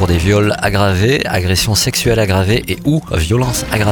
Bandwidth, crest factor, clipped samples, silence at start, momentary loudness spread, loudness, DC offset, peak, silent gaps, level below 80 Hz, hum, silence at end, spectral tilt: 19 kHz; 14 dB; under 0.1%; 0 s; 3 LU; -14 LUFS; under 0.1%; 0 dBFS; none; -28 dBFS; none; 0 s; -4.5 dB/octave